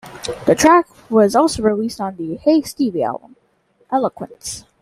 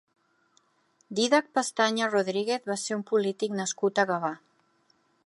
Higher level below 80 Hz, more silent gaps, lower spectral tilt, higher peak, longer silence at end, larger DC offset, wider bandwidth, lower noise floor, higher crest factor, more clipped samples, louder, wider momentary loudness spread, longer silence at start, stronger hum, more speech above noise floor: first, -50 dBFS vs -82 dBFS; neither; about the same, -4.5 dB/octave vs -3.5 dB/octave; first, -2 dBFS vs -8 dBFS; second, 0.2 s vs 0.9 s; neither; first, 15 kHz vs 11.5 kHz; second, -59 dBFS vs -68 dBFS; about the same, 16 dB vs 20 dB; neither; first, -17 LUFS vs -27 LUFS; first, 16 LU vs 7 LU; second, 0.05 s vs 1.1 s; neither; about the same, 43 dB vs 42 dB